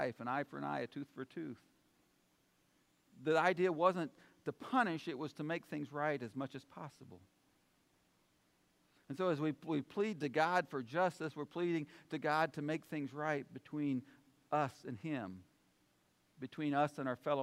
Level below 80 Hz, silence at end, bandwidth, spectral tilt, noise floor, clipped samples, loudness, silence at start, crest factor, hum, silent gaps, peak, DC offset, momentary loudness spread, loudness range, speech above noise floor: -86 dBFS; 0 s; 15.5 kHz; -6.5 dB/octave; -76 dBFS; under 0.1%; -39 LUFS; 0 s; 22 dB; none; none; -18 dBFS; under 0.1%; 14 LU; 8 LU; 37 dB